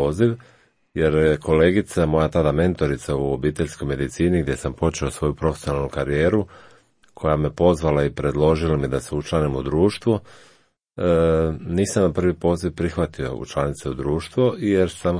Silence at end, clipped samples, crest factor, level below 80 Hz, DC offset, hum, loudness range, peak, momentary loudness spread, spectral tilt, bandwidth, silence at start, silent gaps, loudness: 0 s; under 0.1%; 18 dB; -36 dBFS; under 0.1%; none; 3 LU; -2 dBFS; 7 LU; -7 dB/octave; 10.5 kHz; 0 s; none; -21 LUFS